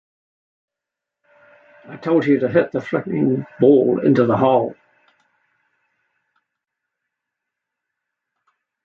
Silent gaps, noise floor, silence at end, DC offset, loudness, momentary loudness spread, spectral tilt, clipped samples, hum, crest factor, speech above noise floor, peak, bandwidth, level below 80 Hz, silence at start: none; -85 dBFS; 4.1 s; under 0.1%; -17 LUFS; 9 LU; -9.5 dB/octave; under 0.1%; none; 20 dB; 68 dB; -2 dBFS; 6.6 kHz; -64 dBFS; 1.9 s